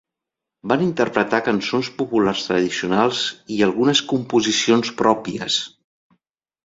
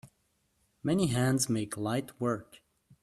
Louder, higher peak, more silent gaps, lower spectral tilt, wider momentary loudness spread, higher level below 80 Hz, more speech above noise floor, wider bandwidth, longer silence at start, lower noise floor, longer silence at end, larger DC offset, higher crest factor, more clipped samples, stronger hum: first, -19 LUFS vs -31 LUFS; first, 0 dBFS vs -16 dBFS; neither; about the same, -4 dB/octave vs -5 dB/octave; about the same, 6 LU vs 7 LU; about the same, -58 dBFS vs -62 dBFS; first, 66 dB vs 44 dB; second, 7.8 kHz vs 14.5 kHz; first, 0.65 s vs 0.05 s; first, -85 dBFS vs -74 dBFS; first, 1 s vs 0.6 s; neither; about the same, 20 dB vs 16 dB; neither; neither